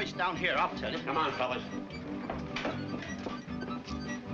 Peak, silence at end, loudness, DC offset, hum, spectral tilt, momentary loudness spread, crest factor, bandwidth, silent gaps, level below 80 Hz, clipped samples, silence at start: -16 dBFS; 0 s; -34 LUFS; under 0.1%; none; -5 dB/octave; 10 LU; 18 dB; 7.8 kHz; none; -56 dBFS; under 0.1%; 0 s